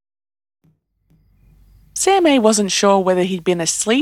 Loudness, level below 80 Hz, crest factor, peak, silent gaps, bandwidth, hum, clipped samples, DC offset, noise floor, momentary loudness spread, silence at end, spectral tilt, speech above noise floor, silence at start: -15 LUFS; -54 dBFS; 18 dB; 0 dBFS; none; 15.5 kHz; none; under 0.1%; under 0.1%; -59 dBFS; 6 LU; 0 s; -3.5 dB/octave; 45 dB; 1.95 s